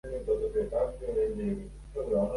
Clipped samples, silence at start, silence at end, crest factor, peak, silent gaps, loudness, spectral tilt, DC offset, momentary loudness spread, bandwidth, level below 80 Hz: under 0.1%; 0.05 s; 0 s; 14 dB; -16 dBFS; none; -32 LUFS; -8.5 dB/octave; under 0.1%; 8 LU; 11.5 kHz; -44 dBFS